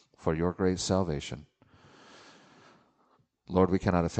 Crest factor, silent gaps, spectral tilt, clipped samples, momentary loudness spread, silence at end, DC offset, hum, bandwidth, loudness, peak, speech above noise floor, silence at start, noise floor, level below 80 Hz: 22 dB; none; -6 dB/octave; under 0.1%; 11 LU; 0 s; under 0.1%; none; 8.8 kHz; -29 LUFS; -10 dBFS; 41 dB; 0.2 s; -69 dBFS; -52 dBFS